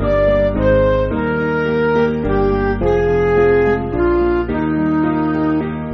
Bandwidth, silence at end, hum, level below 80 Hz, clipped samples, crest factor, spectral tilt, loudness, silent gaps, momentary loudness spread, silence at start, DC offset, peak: 6.2 kHz; 0 s; none; -28 dBFS; under 0.1%; 12 dB; -7 dB/octave; -16 LUFS; none; 4 LU; 0 s; under 0.1%; -4 dBFS